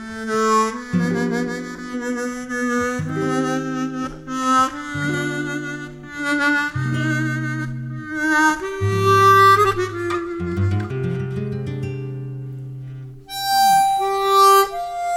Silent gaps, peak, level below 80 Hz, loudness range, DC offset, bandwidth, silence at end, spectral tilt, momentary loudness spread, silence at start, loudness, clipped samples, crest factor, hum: none; -2 dBFS; -50 dBFS; 7 LU; under 0.1%; 18 kHz; 0 s; -5 dB/octave; 16 LU; 0 s; -19 LUFS; under 0.1%; 18 dB; none